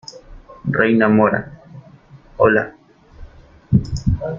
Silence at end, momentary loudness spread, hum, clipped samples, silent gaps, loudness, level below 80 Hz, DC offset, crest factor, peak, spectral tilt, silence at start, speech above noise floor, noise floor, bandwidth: 0 s; 20 LU; none; under 0.1%; none; -17 LUFS; -36 dBFS; under 0.1%; 18 dB; -2 dBFS; -8 dB/octave; 0.15 s; 29 dB; -45 dBFS; 7.6 kHz